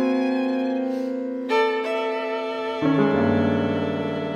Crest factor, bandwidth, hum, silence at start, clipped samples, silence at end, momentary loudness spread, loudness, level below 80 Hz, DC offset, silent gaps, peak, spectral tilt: 16 dB; 9 kHz; none; 0 s; under 0.1%; 0 s; 7 LU; -23 LUFS; -64 dBFS; under 0.1%; none; -6 dBFS; -7.5 dB/octave